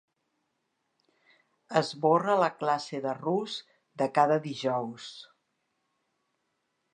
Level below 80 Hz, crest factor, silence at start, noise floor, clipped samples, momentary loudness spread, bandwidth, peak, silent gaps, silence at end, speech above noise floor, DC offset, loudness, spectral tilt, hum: -84 dBFS; 24 dB; 1.7 s; -79 dBFS; under 0.1%; 15 LU; 10 kHz; -8 dBFS; none; 1.7 s; 51 dB; under 0.1%; -28 LUFS; -5.5 dB/octave; none